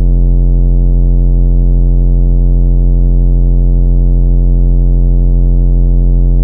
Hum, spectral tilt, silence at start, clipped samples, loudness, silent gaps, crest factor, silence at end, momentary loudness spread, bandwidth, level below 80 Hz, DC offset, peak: none; -13.5 dB/octave; 0 s; under 0.1%; -12 LUFS; none; 6 dB; 0 s; 0 LU; 1 kHz; -8 dBFS; under 0.1%; 0 dBFS